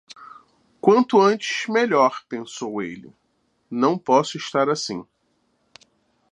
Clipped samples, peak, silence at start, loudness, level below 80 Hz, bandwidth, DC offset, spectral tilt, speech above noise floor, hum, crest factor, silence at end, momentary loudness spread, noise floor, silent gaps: under 0.1%; -2 dBFS; 0.2 s; -21 LUFS; -72 dBFS; 10.5 kHz; under 0.1%; -4.5 dB/octave; 48 dB; none; 20 dB; 1.3 s; 16 LU; -68 dBFS; none